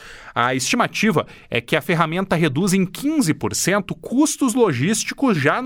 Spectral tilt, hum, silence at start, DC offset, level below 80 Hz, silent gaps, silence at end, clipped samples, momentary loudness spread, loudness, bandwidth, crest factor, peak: -4.5 dB/octave; none; 0 s; under 0.1%; -52 dBFS; none; 0 s; under 0.1%; 5 LU; -19 LUFS; 18 kHz; 18 dB; -2 dBFS